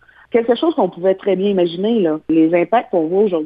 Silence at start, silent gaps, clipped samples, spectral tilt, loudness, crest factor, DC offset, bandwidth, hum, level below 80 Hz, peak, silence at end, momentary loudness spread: 0.35 s; none; under 0.1%; -10 dB/octave; -16 LUFS; 14 dB; under 0.1%; 5 kHz; none; -62 dBFS; -2 dBFS; 0 s; 4 LU